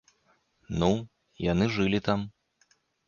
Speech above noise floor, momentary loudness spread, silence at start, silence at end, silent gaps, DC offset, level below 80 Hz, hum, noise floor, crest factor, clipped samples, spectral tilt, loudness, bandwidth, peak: 43 dB; 12 LU; 0.7 s; 0.8 s; none; under 0.1%; -50 dBFS; none; -69 dBFS; 20 dB; under 0.1%; -6.5 dB/octave; -28 LUFS; 7.2 kHz; -10 dBFS